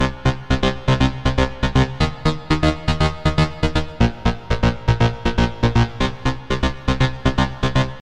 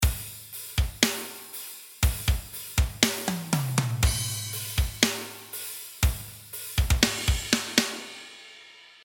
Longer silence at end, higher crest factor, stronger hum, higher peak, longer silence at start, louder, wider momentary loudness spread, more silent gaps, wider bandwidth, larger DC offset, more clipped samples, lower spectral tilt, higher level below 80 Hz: second, 0 s vs 0.15 s; second, 18 dB vs 28 dB; neither; about the same, -2 dBFS vs 0 dBFS; about the same, 0 s vs 0 s; first, -20 LUFS vs -27 LUFS; second, 4 LU vs 15 LU; neither; second, 10 kHz vs 19.5 kHz; neither; neither; first, -6.5 dB/octave vs -3 dB/octave; first, -26 dBFS vs -32 dBFS